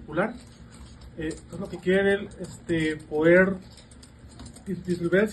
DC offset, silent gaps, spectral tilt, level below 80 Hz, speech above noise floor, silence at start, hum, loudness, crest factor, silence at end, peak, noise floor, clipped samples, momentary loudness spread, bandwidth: under 0.1%; none; -6.5 dB/octave; -50 dBFS; 23 dB; 0 s; none; -25 LUFS; 20 dB; 0 s; -8 dBFS; -48 dBFS; under 0.1%; 24 LU; 12 kHz